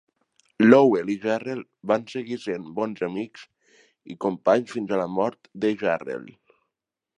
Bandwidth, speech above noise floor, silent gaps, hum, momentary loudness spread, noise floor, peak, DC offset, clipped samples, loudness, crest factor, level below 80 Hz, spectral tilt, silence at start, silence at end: 9.8 kHz; 62 dB; none; none; 17 LU; -85 dBFS; 0 dBFS; under 0.1%; under 0.1%; -24 LUFS; 24 dB; -70 dBFS; -7 dB/octave; 0.6 s; 0.9 s